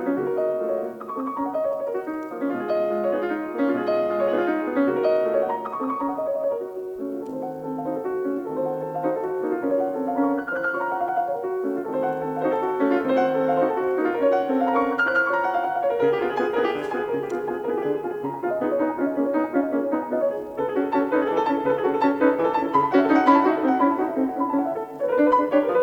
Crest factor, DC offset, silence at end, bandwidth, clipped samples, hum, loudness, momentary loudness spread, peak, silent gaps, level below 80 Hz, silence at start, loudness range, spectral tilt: 18 dB; under 0.1%; 0 s; 18.5 kHz; under 0.1%; none; -23 LUFS; 8 LU; -4 dBFS; none; -64 dBFS; 0 s; 6 LU; -7 dB/octave